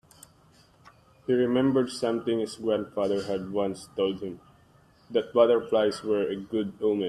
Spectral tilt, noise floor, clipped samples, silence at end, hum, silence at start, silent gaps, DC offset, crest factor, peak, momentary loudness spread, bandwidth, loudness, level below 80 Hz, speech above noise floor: -6 dB/octave; -59 dBFS; under 0.1%; 0 s; none; 1.3 s; none; under 0.1%; 20 dB; -8 dBFS; 9 LU; 12.5 kHz; -27 LUFS; -66 dBFS; 33 dB